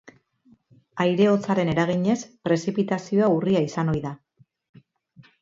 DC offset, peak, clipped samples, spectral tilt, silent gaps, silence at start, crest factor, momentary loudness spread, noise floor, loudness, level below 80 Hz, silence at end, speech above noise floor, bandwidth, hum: under 0.1%; -8 dBFS; under 0.1%; -7 dB/octave; none; 0.05 s; 16 dB; 8 LU; -60 dBFS; -23 LUFS; -56 dBFS; 1.25 s; 38 dB; 7.8 kHz; none